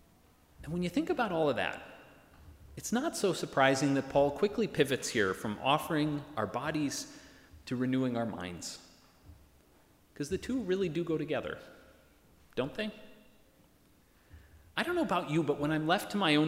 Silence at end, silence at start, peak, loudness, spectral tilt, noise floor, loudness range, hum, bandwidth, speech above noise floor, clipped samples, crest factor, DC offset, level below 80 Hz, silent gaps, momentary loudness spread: 0 s; 0.6 s; -10 dBFS; -32 LUFS; -5 dB/octave; -65 dBFS; 8 LU; none; 16 kHz; 33 dB; under 0.1%; 24 dB; under 0.1%; -62 dBFS; none; 14 LU